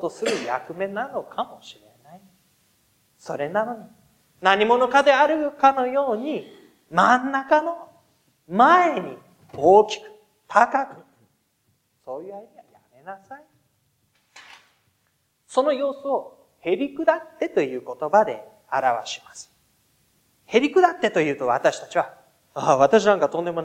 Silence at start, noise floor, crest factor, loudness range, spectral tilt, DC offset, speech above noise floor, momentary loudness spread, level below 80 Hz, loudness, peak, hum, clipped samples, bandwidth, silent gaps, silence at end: 0 s; -69 dBFS; 22 dB; 12 LU; -4.5 dB/octave; under 0.1%; 48 dB; 20 LU; -70 dBFS; -21 LUFS; -2 dBFS; none; under 0.1%; 15 kHz; none; 0 s